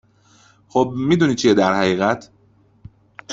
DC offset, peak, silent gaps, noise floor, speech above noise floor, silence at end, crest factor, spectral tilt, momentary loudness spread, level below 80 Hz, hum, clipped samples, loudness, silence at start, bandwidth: under 0.1%; -2 dBFS; none; -55 dBFS; 38 dB; 0 s; 18 dB; -5.5 dB/octave; 7 LU; -54 dBFS; none; under 0.1%; -18 LUFS; 0.75 s; 8 kHz